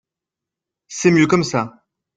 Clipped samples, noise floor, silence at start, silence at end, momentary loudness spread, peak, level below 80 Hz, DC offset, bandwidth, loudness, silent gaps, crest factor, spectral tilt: under 0.1%; -86 dBFS; 0.9 s; 0.5 s; 16 LU; -2 dBFS; -56 dBFS; under 0.1%; 9.2 kHz; -17 LUFS; none; 18 dB; -5.5 dB/octave